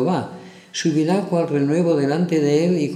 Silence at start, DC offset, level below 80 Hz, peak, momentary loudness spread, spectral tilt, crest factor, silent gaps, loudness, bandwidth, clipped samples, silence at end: 0 s; under 0.1%; -68 dBFS; -6 dBFS; 10 LU; -6.5 dB/octave; 14 dB; none; -19 LUFS; 11.5 kHz; under 0.1%; 0 s